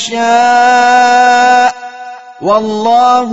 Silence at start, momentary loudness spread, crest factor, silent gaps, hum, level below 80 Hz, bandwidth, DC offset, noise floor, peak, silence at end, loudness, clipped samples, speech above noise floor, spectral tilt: 0 s; 19 LU; 8 dB; none; none; -56 dBFS; 8.2 kHz; 0.8%; -28 dBFS; 0 dBFS; 0 s; -8 LUFS; under 0.1%; 20 dB; -2.5 dB/octave